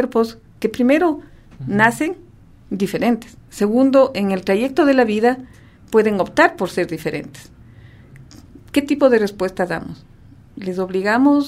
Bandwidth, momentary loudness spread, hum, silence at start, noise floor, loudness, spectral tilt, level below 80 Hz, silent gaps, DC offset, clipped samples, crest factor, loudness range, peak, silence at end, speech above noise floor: 15.5 kHz; 14 LU; none; 0 s; -43 dBFS; -18 LUFS; -6 dB/octave; -50 dBFS; none; under 0.1%; under 0.1%; 18 dB; 5 LU; 0 dBFS; 0 s; 26 dB